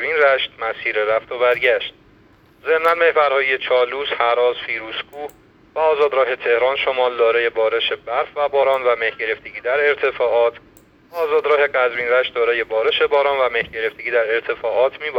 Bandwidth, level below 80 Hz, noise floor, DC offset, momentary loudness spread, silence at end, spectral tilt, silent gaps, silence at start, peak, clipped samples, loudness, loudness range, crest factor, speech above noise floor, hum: 16 kHz; -58 dBFS; -51 dBFS; under 0.1%; 8 LU; 0 s; -4 dB/octave; none; 0 s; -2 dBFS; under 0.1%; -18 LUFS; 1 LU; 18 dB; 33 dB; none